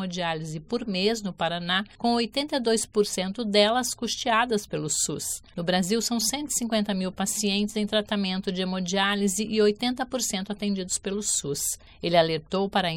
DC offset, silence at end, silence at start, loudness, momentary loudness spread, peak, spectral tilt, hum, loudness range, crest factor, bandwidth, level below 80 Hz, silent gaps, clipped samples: under 0.1%; 0 s; 0 s; -26 LUFS; 6 LU; -6 dBFS; -3.5 dB/octave; none; 1 LU; 20 dB; 17 kHz; -56 dBFS; none; under 0.1%